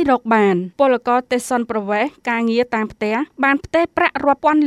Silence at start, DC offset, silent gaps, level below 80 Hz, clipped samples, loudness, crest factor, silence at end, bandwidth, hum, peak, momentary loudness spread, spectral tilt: 0 s; under 0.1%; none; -52 dBFS; under 0.1%; -18 LUFS; 16 dB; 0 s; 14 kHz; none; -2 dBFS; 6 LU; -5.5 dB/octave